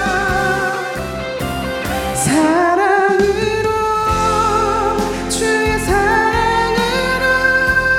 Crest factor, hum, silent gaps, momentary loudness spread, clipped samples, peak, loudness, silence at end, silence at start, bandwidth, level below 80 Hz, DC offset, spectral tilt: 14 dB; none; none; 8 LU; under 0.1%; -2 dBFS; -15 LUFS; 0 s; 0 s; 18 kHz; -32 dBFS; under 0.1%; -4 dB/octave